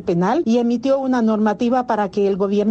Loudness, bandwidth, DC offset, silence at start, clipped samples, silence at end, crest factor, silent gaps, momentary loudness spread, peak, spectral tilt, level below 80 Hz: -18 LUFS; 8 kHz; under 0.1%; 0 s; under 0.1%; 0 s; 10 dB; none; 2 LU; -8 dBFS; -7.5 dB/octave; -54 dBFS